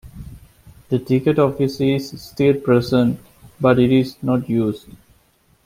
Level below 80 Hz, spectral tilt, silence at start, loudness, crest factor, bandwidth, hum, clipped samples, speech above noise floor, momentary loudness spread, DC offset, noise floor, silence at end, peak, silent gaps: -48 dBFS; -8 dB/octave; 0.05 s; -18 LUFS; 16 dB; 16 kHz; none; under 0.1%; 40 dB; 15 LU; under 0.1%; -58 dBFS; 0.85 s; -2 dBFS; none